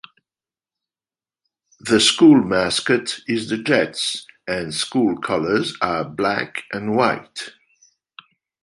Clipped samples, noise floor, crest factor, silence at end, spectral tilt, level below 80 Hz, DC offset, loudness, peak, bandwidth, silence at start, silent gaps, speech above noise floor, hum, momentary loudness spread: under 0.1%; under -90 dBFS; 18 dB; 1.15 s; -4 dB/octave; -56 dBFS; under 0.1%; -19 LUFS; -2 dBFS; 11.5 kHz; 1.85 s; none; over 71 dB; none; 15 LU